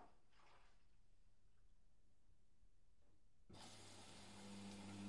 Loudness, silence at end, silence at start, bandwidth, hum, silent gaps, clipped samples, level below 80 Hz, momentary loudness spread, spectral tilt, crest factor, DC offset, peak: -59 LUFS; 0 s; 0 s; 11.5 kHz; none; none; under 0.1%; -76 dBFS; 6 LU; -4 dB/octave; 18 dB; under 0.1%; -44 dBFS